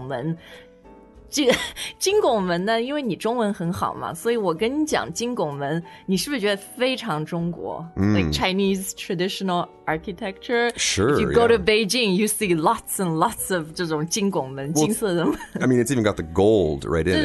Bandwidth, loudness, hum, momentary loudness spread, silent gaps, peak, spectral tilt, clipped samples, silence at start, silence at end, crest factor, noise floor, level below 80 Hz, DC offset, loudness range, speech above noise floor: 12.5 kHz; -22 LUFS; none; 9 LU; none; -4 dBFS; -4.5 dB/octave; under 0.1%; 0 s; 0 s; 18 dB; -47 dBFS; -46 dBFS; under 0.1%; 4 LU; 25 dB